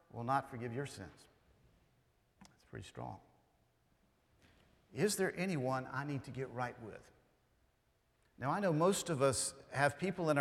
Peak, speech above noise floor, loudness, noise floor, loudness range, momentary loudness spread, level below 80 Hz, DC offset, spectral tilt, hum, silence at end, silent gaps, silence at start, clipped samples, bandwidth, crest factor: -16 dBFS; 39 dB; -37 LUFS; -76 dBFS; 19 LU; 19 LU; -72 dBFS; under 0.1%; -4.5 dB/octave; none; 0 s; none; 0.15 s; under 0.1%; 17 kHz; 24 dB